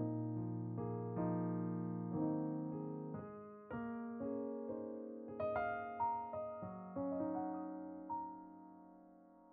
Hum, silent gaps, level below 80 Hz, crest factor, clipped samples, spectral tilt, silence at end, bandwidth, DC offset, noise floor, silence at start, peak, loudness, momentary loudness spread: none; none; -74 dBFS; 16 dB; under 0.1%; -9.5 dB/octave; 0 s; 3.8 kHz; under 0.1%; -63 dBFS; 0 s; -26 dBFS; -43 LUFS; 13 LU